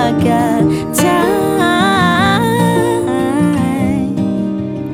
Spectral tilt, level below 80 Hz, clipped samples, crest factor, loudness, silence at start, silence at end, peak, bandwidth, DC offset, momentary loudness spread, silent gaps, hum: -5.5 dB/octave; -40 dBFS; under 0.1%; 12 dB; -13 LUFS; 0 s; 0 s; 0 dBFS; 17 kHz; under 0.1%; 5 LU; none; none